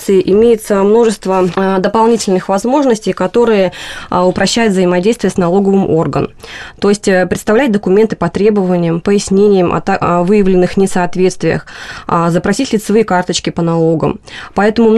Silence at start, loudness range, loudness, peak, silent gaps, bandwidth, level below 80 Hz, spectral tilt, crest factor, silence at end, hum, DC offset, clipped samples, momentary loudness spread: 0 s; 2 LU; -12 LUFS; 0 dBFS; none; 13 kHz; -38 dBFS; -6 dB/octave; 10 dB; 0 s; none; under 0.1%; under 0.1%; 6 LU